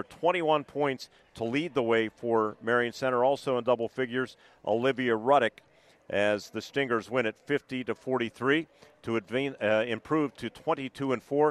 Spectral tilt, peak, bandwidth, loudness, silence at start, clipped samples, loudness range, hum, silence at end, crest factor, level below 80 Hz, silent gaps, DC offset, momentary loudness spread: -5.5 dB/octave; -10 dBFS; 13 kHz; -29 LUFS; 0 s; under 0.1%; 2 LU; none; 0 s; 18 dB; -70 dBFS; none; under 0.1%; 8 LU